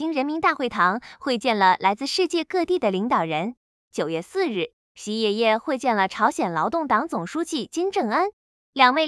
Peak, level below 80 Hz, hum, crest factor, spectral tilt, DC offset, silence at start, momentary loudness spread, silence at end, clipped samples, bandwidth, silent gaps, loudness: -2 dBFS; -64 dBFS; none; 22 dB; -4 dB/octave; under 0.1%; 0 s; 10 LU; 0 s; under 0.1%; 12 kHz; 3.57-3.91 s, 4.73-4.95 s, 8.33-8.73 s; -23 LUFS